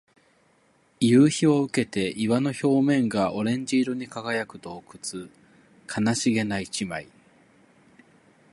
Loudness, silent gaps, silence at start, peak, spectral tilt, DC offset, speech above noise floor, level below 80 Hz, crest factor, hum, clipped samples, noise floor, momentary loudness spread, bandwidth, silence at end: -24 LUFS; none; 1 s; -8 dBFS; -5.5 dB/octave; under 0.1%; 39 dB; -62 dBFS; 18 dB; none; under 0.1%; -63 dBFS; 16 LU; 11.5 kHz; 1.5 s